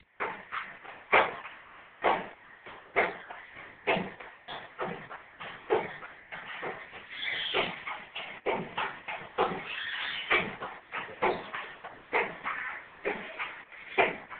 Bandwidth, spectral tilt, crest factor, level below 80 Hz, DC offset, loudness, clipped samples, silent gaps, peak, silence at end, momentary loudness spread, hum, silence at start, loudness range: 4.6 kHz; -1 dB/octave; 26 dB; -66 dBFS; under 0.1%; -33 LUFS; under 0.1%; none; -8 dBFS; 0 s; 17 LU; none; 0.2 s; 4 LU